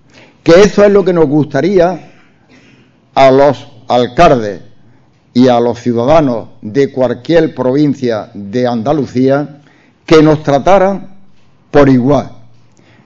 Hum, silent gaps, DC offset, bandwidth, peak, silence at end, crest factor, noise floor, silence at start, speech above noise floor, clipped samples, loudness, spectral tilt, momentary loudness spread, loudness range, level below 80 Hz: none; none; under 0.1%; 7.6 kHz; 0 dBFS; 0.65 s; 10 dB; -46 dBFS; 0.45 s; 37 dB; 0.7%; -10 LUFS; -7 dB/octave; 11 LU; 2 LU; -36 dBFS